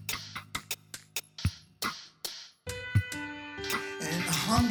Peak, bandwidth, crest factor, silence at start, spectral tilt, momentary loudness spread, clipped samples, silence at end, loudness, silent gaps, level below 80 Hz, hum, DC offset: -12 dBFS; over 20 kHz; 22 dB; 0 s; -4 dB/octave; 10 LU; under 0.1%; 0 s; -34 LUFS; none; -50 dBFS; none; under 0.1%